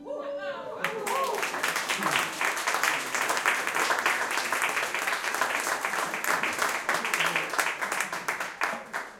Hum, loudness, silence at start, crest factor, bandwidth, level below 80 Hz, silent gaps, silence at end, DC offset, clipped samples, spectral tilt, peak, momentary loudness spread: none; -27 LUFS; 0 s; 22 dB; 17 kHz; -72 dBFS; none; 0 s; under 0.1%; under 0.1%; -0.5 dB/octave; -6 dBFS; 6 LU